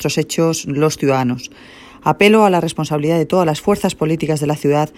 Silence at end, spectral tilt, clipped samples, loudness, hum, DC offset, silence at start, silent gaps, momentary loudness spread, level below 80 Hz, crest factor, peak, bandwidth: 0.1 s; -5.5 dB/octave; under 0.1%; -16 LUFS; none; under 0.1%; 0 s; none; 8 LU; -50 dBFS; 16 dB; 0 dBFS; 16 kHz